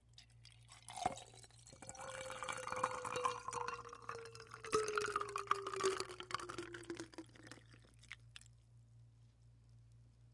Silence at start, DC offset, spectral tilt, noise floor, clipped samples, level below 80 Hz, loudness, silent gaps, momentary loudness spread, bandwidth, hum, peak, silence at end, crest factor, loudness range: 0.1 s; under 0.1%; -3 dB/octave; -66 dBFS; under 0.1%; -72 dBFS; -44 LUFS; none; 23 LU; 11.5 kHz; none; -20 dBFS; 0 s; 28 dB; 13 LU